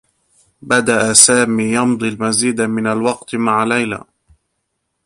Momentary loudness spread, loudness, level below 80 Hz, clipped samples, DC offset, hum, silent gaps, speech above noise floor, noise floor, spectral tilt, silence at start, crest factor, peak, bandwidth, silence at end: 11 LU; -14 LUFS; -54 dBFS; 0.1%; under 0.1%; none; none; 57 dB; -72 dBFS; -3 dB/octave; 0.65 s; 16 dB; 0 dBFS; 16 kHz; 1.05 s